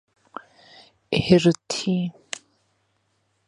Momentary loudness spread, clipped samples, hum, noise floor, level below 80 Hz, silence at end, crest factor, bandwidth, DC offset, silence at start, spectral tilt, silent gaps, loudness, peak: 24 LU; under 0.1%; none; -70 dBFS; -54 dBFS; 1.4 s; 24 dB; 11 kHz; under 0.1%; 1.1 s; -5.5 dB/octave; none; -22 LUFS; -2 dBFS